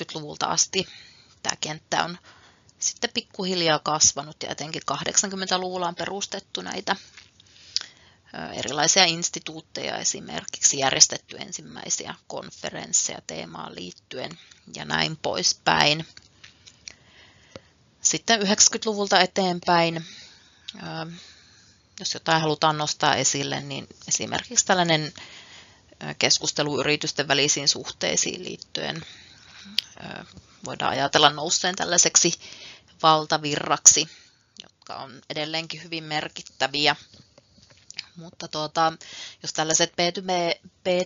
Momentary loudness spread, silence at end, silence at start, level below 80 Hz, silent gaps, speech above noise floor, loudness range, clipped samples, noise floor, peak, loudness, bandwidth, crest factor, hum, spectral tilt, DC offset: 20 LU; 0 s; 0 s; -66 dBFS; none; 31 dB; 7 LU; under 0.1%; -56 dBFS; 0 dBFS; -22 LUFS; 8 kHz; 26 dB; none; -1.5 dB/octave; under 0.1%